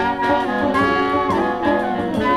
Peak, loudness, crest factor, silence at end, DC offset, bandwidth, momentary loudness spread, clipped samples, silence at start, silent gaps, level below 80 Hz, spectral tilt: -4 dBFS; -18 LUFS; 14 dB; 0 s; under 0.1%; 13 kHz; 3 LU; under 0.1%; 0 s; none; -44 dBFS; -6.5 dB/octave